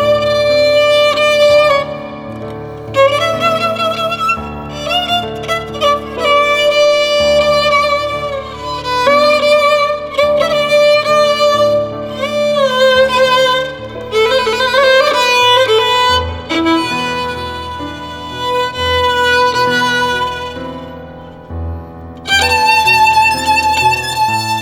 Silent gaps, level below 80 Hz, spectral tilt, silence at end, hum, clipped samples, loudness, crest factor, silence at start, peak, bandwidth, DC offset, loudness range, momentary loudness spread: none; -38 dBFS; -3 dB/octave; 0 s; none; under 0.1%; -12 LUFS; 12 dB; 0 s; 0 dBFS; 17.5 kHz; under 0.1%; 4 LU; 15 LU